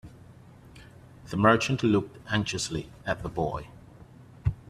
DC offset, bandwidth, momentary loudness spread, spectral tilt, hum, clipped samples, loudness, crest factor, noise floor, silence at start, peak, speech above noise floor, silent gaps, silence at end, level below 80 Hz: under 0.1%; 13.5 kHz; 13 LU; -5.5 dB/octave; none; under 0.1%; -28 LUFS; 24 dB; -51 dBFS; 0.05 s; -6 dBFS; 24 dB; none; 0.1 s; -48 dBFS